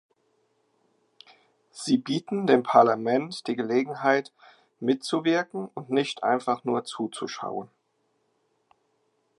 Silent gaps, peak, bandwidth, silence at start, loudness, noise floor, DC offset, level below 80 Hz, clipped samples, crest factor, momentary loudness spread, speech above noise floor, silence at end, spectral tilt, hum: none; -4 dBFS; 11.5 kHz; 1.75 s; -26 LUFS; -73 dBFS; under 0.1%; -82 dBFS; under 0.1%; 24 dB; 14 LU; 47 dB; 1.75 s; -5 dB/octave; none